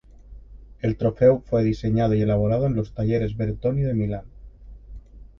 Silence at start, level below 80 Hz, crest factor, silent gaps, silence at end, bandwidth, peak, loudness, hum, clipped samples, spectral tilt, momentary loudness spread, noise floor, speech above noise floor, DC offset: 0.3 s; -40 dBFS; 18 dB; none; 0.15 s; 6.6 kHz; -4 dBFS; -23 LUFS; none; under 0.1%; -10 dB/octave; 8 LU; -44 dBFS; 22 dB; under 0.1%